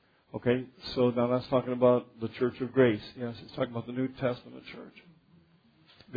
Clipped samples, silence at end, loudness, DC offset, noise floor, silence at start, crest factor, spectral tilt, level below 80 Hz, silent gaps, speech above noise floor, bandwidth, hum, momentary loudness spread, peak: under 0.1%; 0 s; -30 LUFS; under 0.1%; -63 dBFS; 0.35 s; 20 dB; -9 dB/octave; -64 dBFS; none; 34 dB; 5 kHz; none; 19 LU; -10 dBFS